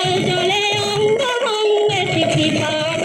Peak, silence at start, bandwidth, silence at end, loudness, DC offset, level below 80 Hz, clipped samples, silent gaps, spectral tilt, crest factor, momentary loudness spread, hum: -6 dBFS; 0 s; 15 kHz; 0 s; -17 LUFS; under 0.1%; -52 dBFS; under 0.1%; none; -4 dB/octave; 10 dB; 2 LU; none